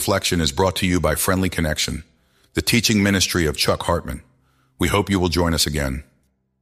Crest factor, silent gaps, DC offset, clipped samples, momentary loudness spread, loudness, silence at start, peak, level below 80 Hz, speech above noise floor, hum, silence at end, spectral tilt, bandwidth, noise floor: 18 dB; none; under 0.1%; under 0.1%; 10 LU; -20 LUFS; 0 s; -4 dBFS; -36 dBFS; 45 dB; none; 0.6 s; -4 dB/octave; 15.5 kHz; -65 dBFS